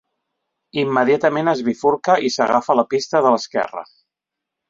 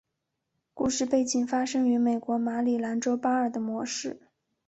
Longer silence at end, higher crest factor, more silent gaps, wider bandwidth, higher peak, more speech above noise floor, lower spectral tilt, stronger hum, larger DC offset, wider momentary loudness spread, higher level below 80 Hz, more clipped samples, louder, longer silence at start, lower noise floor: first, 0.85 s vs 0.5 s; about the same, 18 dB vs 16 dB; neither; about the same, 7.8 kHz vs 8.2 kHz; first, -2 dBFS vs -12 dBFS; first, 66 dB vs 55 dB; first, -5 dB/octave vs -3.5 dB/octave; neither; neither; about the same, 7 LU vs 7 LU; about the same, -64 dBFS vs -64 dBFS; neither; first, -18 LUFS vs -27 LUFS; about the same, 0.75 s vs 0.75 s; about the same, -83 dBFS vs -82 dBFS